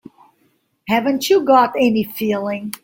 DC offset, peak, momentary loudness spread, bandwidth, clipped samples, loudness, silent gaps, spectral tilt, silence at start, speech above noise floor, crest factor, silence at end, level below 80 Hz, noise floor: under 0.1%; -2 dBFS; 9 LU; 17 kHz; under 0.1%; -17 LUFS; none; -4.5 dB/octave; 0.85 s; 46 dB; 16 dB; 0.05 s; -60 dBFS; -63 dBFS